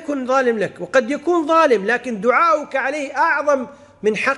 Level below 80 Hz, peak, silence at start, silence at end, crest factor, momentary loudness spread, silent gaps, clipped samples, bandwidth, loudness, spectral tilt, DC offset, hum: -64 dBFS; -4 dBFS; 0 s; 0 s; 14 dB; 7 LU; none; under 0.1%; 11.5 kHz; -18 LUFS; -4.5 dB/octave; under 0.1%; none